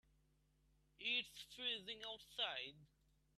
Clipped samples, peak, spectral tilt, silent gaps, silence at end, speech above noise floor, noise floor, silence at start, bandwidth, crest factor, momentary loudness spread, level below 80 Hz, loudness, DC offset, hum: under 0.1%; -28 dBFS; -1.5 dB/octave; none; 0.5 s; 29 dB; -78 dBFS; 1 s; 14 kHz; 22 dB; 9 LU; -80 dBFS; -45 LUFS; under 0.1%; none